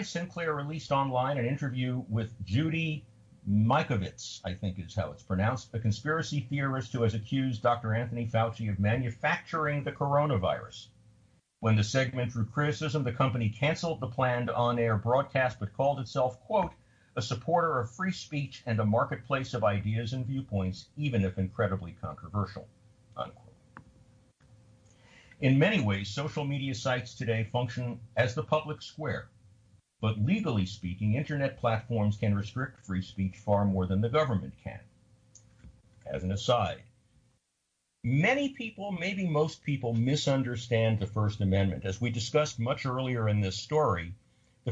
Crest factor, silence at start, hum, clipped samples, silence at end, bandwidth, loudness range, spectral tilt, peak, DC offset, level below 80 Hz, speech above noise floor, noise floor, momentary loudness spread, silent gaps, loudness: 18 dB; 0 s; none; under 0.1%; 0 s; 8 kHz; 4 LU; -6.5 dB/octave; -14 dBFS; under 0.1%; -58 dBFS; 50 dB; -79 dBFS; 9 LU; none; -31 LUFS